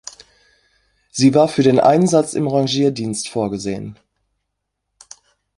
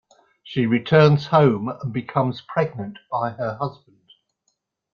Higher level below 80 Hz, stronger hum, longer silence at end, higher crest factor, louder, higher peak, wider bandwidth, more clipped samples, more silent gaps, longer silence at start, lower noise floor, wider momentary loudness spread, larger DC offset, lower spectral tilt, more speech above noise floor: about the same, -56 dBFS vs -58 dBFS; neither; first, 1.65 s vs 1.2 s; about the same, 18 dB vs 20 dB; first, -16 LUFS vs -21 LUFS; about the same, -2 dBFS vs -2 dBFS; first, 11.5 kHz vs 6.8 kHz; neither; neither; first, 1.15 s vs 0.45 s; about the same, -76 dBFS vs -73 dBFS; about the same, 16 LU vs 14 LU; neither; second, -5.5 dB/octave vs -8.5 dB/octave; first, 61 dB vs 53 dB